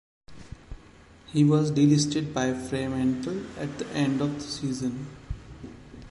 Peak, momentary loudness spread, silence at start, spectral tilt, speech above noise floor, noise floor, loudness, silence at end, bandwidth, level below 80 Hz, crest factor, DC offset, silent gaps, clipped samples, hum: -10 dBFS; 23 LU; 0.3 s; -6 dB/octave; 27 dB; -52 dBFS; -26 LUFS; 0 s; 11.5 kHz; -48 dBFS; 18 dB; under 0.1%; none; under 0.1%; none